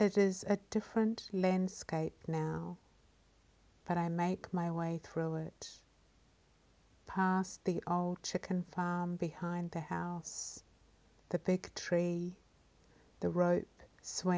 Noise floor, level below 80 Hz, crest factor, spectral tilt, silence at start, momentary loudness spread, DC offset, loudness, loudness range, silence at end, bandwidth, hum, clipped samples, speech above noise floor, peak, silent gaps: -68 dBFS; -68 dBFS; 20 dB; -6 dB/octave; 0 s; 10 LU; under 0.1%; -37 LUFS; 3 LU; 0 s; 8 kHz; none; under 0.1%; 33 dB; -18 dBFS; none